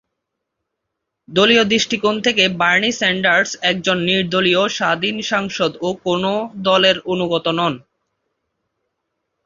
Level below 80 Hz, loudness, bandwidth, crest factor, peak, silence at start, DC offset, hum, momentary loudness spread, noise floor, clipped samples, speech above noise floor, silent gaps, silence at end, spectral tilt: -56 dBFS; -16 LUFS; 7.6 kHz; 18 dB; 0 dBFS; 1.3 s; under 0.1%; none; 7 LU; -78 dBFS; under 0.1%; 61 dB; none; 1.65 s; -3.5 dB/octave